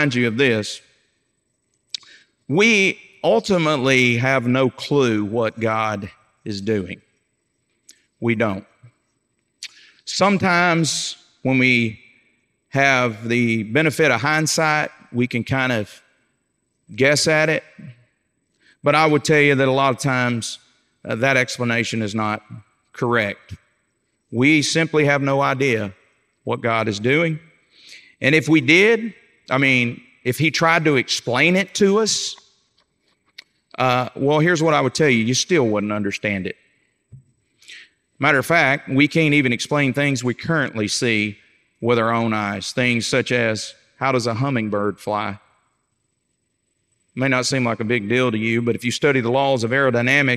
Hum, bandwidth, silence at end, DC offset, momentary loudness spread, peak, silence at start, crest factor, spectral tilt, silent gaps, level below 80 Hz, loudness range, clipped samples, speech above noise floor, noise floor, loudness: none; 15.5 kHz; 0 s; under 0.1%; 13 LU; 0 dBFS; 0 s; 20 dB; -4.5 dB/octave; none; -64 dBFS; 6 LU; under 0.1%; 53 dB; -71 dBFS; -18 LUFS